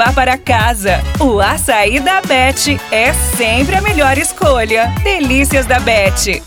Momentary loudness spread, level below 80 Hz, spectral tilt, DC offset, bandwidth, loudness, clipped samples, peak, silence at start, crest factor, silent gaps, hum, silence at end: 3 LU; -22 dBFS; -4 dB/octave; under 0.1%; over 20 kHz; -11 LUFS; under 0.1%; 0 dBFS; 0 s; 10 dB; none; none; 0 s